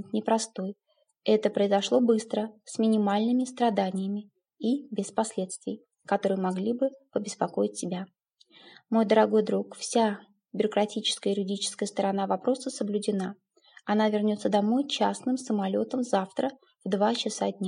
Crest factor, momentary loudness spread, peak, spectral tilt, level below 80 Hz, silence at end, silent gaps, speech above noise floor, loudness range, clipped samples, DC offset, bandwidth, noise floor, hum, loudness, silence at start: 20 dB; 10 LU; -8 dBFS; -5 dB/octave; -84 dBFS; 0 s; none; 31 dB; 4 LU; under 0.1%; under 0.1%; 11 kHz; -58 dBFS; none; -28 LUFS; 0 s